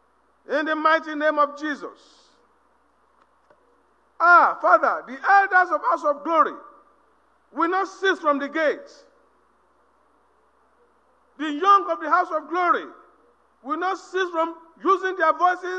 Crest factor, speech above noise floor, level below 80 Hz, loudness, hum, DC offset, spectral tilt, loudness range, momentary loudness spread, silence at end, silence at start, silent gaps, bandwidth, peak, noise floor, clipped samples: 20 dB; 42 dB; -76 dBFS; -21 LUFS; none; under 0.1%; -2.5 dB/octave; 8 LU; 14 LU; 0 s; 0.5 s; none; 8.8 kHz; -2 dBFS; -63 dBFS; under 0.1%